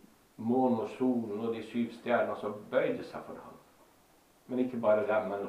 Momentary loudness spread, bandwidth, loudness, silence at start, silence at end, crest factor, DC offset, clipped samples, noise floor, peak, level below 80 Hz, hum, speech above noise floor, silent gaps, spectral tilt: 14 LU; 14.5 kHz; -32 LUFS; 0.4 s; 0 s; 18 dB; under 0.1%; under 0.1%; -64 dBFS; -14 dBFS; -74 dBFS; none; 32 dB; none; -7.5 dB/octave